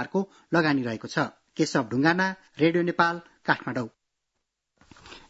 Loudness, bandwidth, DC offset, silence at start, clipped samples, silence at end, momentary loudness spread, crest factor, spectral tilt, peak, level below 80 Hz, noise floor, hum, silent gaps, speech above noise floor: -26 LUFS; 8 kHz; under 0.1%; 0 s; under 0.1%; 0.1 s; 9 LU; 22 dB; -5.5 dB/octave; -4 dBFS; -66 dBFS; -81 dBFS; none; none; 55 dB